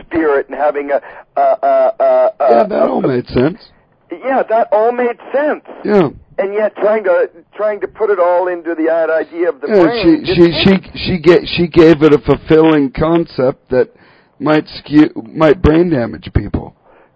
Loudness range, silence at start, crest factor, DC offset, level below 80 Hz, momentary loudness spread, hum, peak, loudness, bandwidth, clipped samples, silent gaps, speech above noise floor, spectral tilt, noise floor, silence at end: 5 LU; 0.1 s; 12 dB; under 0.1%; -34 dBFS; 9 LU; none; 0 dBFS; -13 LUFS; 7.4 kHz; 0.6%; none; 19 dB; -8.5 dB/octave; -31 dBFS; 0.45 s